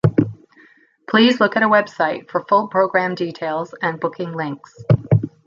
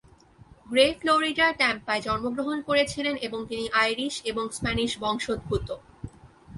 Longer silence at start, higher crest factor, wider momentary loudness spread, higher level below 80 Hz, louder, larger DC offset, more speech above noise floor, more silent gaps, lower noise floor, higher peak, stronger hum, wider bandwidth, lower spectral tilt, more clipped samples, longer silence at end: second, 0.05 s vs 0.65 s; about the same, 18 dB vs 22 dB; about the same, 11 LU vs 10 LU; about the same, -50 dBFS vs -48 dBFS; first, -19 LUFS vs -25 LUFS; neither; first, 33 dB vs 27 dB; neither; about the same, -52 dBFS vs -53 dBFS; first, -2 dBFS vs -6 dBFS; neither; second, 7.4 kHz vs 11.5 kHz; first, -7.5 dB/octave vs -3.5 dB/octave; neither; first, 0.2 s vs 0 s